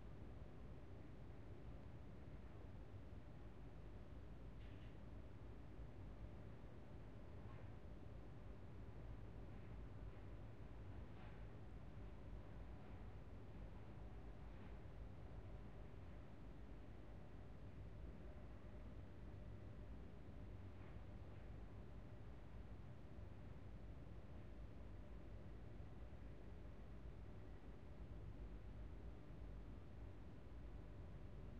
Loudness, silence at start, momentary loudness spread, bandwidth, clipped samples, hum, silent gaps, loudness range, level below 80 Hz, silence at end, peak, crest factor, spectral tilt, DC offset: -59 LUFS; 0 s; 2 LU; 7.2 kHz; under 0.1%; none; none; 1 LU; -60 dBFS; 0 s; -42 dBFS; 12 dB; -7.5 dB/octave; 0.1%